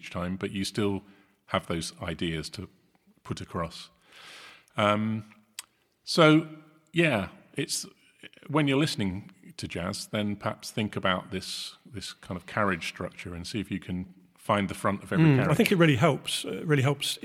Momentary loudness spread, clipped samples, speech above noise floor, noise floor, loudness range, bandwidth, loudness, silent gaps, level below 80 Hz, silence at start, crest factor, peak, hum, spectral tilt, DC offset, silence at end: 21 LU; under 0.1%; 22 dB; -50 dBFS; 8 LU; 15.5 kHz; -28 LUFS; none; -58 dBFS; 0.05 s; 24 dB; -6 dBFS; none; -5.5 dB/octave; under 0.1%; 0.05 s